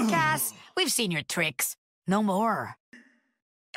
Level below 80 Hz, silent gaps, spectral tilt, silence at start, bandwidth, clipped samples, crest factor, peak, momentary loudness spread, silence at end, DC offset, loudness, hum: -68 dBFS; 1.78-2.02 s, 2.80-2.92 s; -3 dB/octave; 0 s; 16 kHz; under 0.1%; 16 dB; -12 dBFS; 7 LU; 0.8 s; under 0.1%; -27 LUFS; none